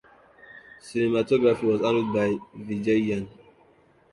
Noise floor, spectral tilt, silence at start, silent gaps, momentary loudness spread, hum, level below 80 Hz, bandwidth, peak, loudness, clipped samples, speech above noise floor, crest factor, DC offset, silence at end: -59 dBFS; -7 dB/octave; 0.55 s; none; 14 LU; none; -60 dBFS; 11.5 kHz; -8 dBFS; -25 LUFS; under 0.1%; 35 dB; 18 dB; under 0.1%; 0.85 s